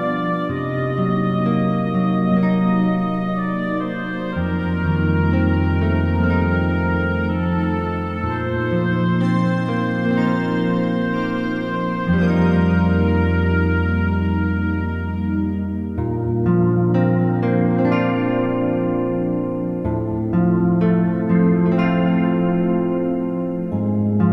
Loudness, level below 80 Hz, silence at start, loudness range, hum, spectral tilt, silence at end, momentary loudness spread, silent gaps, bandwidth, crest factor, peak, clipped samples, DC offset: -19 LUFS; -36 dBFS; 0 s; 2 LU; none; -9.5 dB/octave; 0 s; 6 LU; none; 5.6 kHz; 14 dB; -4 dBFS; under 0.1%; under 0.1%